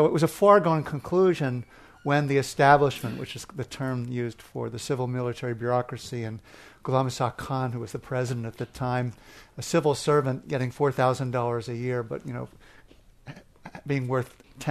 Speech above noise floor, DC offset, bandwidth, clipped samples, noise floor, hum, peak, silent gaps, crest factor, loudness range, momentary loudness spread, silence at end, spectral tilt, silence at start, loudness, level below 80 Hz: 28 dB; under 0.1%; 13.5 kHz; under 0.1%; -54 dBFS; none; -4 dBFS; none; 22 dB; 7 LU; 16 LU; 0 s; -6 dB/octave; 0 s; -26 LUFS; -56 dBFS